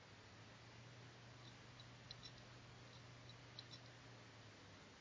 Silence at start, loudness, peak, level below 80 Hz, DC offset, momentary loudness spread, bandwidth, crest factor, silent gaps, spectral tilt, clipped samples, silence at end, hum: 0 s; -60 LUFS; -40 dBFS; -76 dBFS; under 0.1%; 4 LU; 8 kHz; 22 dB; none; -4 dB/octave; under 0.1%; 0 s; none